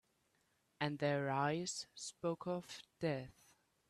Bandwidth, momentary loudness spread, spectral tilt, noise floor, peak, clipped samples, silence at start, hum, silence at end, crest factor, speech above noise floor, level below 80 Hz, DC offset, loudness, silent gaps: 13 kHz; 10 LU; -5 dB/octave; -79 dBFS; -22 dBFS; under 0.1%; 0.8 s; none; 0.6 s; 20 dB; 38 dB; -78 dBFS; under 0.1%; -41 LUFS; none